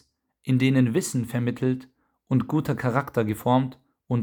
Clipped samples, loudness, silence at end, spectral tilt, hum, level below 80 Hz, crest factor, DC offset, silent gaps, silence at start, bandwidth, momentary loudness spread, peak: under 0.1%; -25 LUFS; 0 s; -6.5 dB/octave; none; -60 dBFS; 18 dB; under 0.1%; none; 0.45 s; over 20 kHz; 8 LU; -6 dBFS